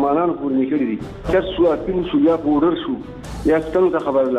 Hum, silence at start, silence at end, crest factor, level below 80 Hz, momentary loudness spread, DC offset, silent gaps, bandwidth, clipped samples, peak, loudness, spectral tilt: none; 0 s; 0 s; 14 dB; -38 dBFS; 8 LU; under 0.1%; none; 10.5 kHz; under 0.1%; -4 dBFS; -19 LUFS; -7.5 dB/octave